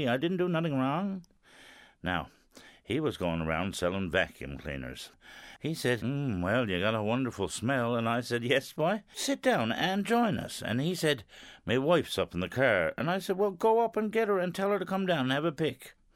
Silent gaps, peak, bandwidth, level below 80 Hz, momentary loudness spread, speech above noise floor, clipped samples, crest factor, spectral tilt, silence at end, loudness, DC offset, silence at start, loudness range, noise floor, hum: none; -12 dBFS; 16 kHz; -58 dBFS; 12 LU; 26 dB; under 0.1%; 18 dB; -5.5 dB/octave; 0.25 s; -30 LUFS; under 0.1%; 0 s; 5 LU; -56 dBFS; none